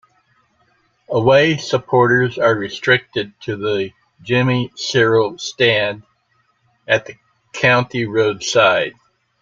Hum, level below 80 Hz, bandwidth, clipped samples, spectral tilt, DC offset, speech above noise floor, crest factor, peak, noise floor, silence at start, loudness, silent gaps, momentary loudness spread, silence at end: none; -56 dBFS; 7.8 kHz; under 0.1%; -5 dB/octave; under 0.1%; 46 dB; 18 dB; 0 dBFS; -63 dBFS; 1.1 s; -16 LUFS; none; 11 LU; 0.5 s